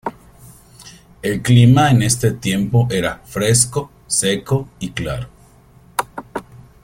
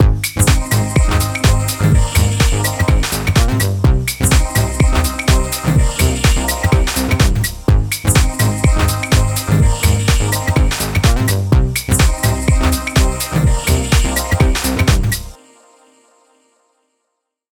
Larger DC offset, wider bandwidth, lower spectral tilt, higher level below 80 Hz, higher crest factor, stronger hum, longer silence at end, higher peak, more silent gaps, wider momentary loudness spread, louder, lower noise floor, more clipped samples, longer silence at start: neither; second, 16.5 kHz vs 19.5 kHz; about the same, -5 dB/octave vs -4.5 dB/octave; second, -44 dBFS vs -18 dBFS; about the same, 18 dB vs 14 dB; neither; second, 0.25 s vs 2.15 s; about the same, 0 dBFS vs 0 dBFS; neither; first, 17 LU vs 2 LU; about the same, -17 LUFS vs -15 LUFS; second, -47 dBFS vs -73 dBFS; neither; about the same, 0.05 s vs 0 s